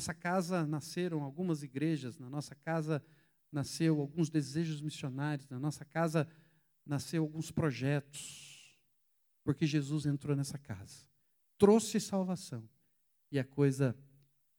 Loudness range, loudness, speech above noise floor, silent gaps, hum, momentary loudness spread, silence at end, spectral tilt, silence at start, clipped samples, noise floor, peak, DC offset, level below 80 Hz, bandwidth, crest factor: 5 LU; -35 LUFS; 41 dB; none; none; 12 LU; 0.55 s; -6 dB/octave; 0 s; under 0.1%; -76 dBFS; -14 dBFS; under 0.1%; -72 dBFS; over 20 kHz; 22 dB